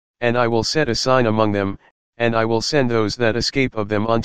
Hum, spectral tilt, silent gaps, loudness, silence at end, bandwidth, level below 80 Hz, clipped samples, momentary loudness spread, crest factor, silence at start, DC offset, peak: none; -5 dB/octave; 1.91-2.13 s; -19 LUFS; 0 s; 15 kHz; -44 dBFS; under 0.1%; 6 LU; 18 dB; 0.15 s; 2%; 0 dBFS